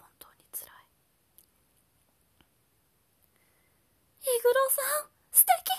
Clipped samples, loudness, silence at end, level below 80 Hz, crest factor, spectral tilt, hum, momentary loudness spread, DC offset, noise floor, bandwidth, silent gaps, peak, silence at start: under 0.1%; -25 LUFS; 0 s; -78 dBFS; 28 dB; 2 dB/octave; none; 20 LU; under 0.1%; -71 dBFS; 14.5 kHz; none; -4 dBFS; 0.55 s